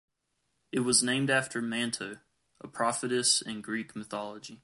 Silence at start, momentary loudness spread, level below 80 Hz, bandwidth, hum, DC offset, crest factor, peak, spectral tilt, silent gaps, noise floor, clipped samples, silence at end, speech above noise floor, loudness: 0.75 s; 13 LU; -74 dBFS; 11.5 kHz; none; under 0.1%; 22 dB; -10 dBFS; -2.5 dB/octave; none; -79 dBFS; under 0.1%; 0.1 s; 48 dB; -29 LUFS